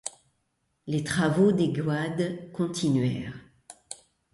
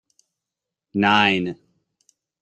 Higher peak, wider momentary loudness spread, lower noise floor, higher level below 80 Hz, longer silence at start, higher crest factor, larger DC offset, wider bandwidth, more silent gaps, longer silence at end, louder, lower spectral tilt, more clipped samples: second, -10 dBFS vs -4 dBFS; first, 21 LU vs 16 LU; second, -75 dBFS vs -86 dBFS; first, -60 dBFS vs -66 dBFS; second, 0.05 s vs 0.95 s; about the same, 18 dB vs 20 dB; neither; first, 11.5 kHz vs 8.8 kHz; neither; second, 0.4 s vs 0.9 s; second, -27 LUFS vs -19 LUFS; about the same, -6 dB/octave vs -5.5 dB/octave; neither